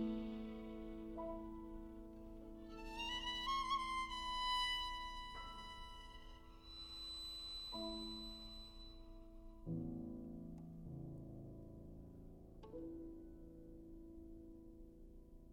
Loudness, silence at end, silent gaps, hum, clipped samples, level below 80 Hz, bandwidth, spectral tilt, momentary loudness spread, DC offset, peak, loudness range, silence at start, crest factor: -47 LUFS; 0 s; none; none; under 0.1%; -58 dBFS; 17 kHz; -4 dB/octave; 19 LU; under 0.1%; -28 dBFS; 14 LU; 0 s; 20 dB